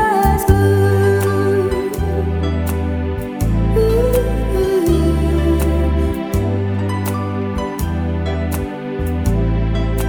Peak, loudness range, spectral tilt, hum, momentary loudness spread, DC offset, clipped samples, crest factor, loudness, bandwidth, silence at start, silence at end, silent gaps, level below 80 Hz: 0 dBFS; 4 LU; -7 dB/octave; none; 7 LU; under 0.1%; under 0.1%; 16 dB; -17 LUFS; over 20 kHz; 0 s; 0 s; none; -22 dBFS